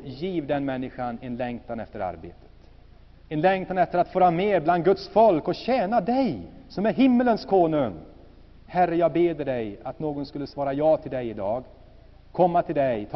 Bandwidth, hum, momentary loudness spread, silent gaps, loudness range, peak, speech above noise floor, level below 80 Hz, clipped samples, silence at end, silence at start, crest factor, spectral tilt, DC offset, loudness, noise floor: 6 kHz; none; 13 LU; none; 6 LU; -8 dBFS; 26 dB; -52 dBFS; under 0.1%; 0 s; 0 s; 18 dB; -5.5 dB/octave; under 0.1%; -24 LUFS; -50 dBFS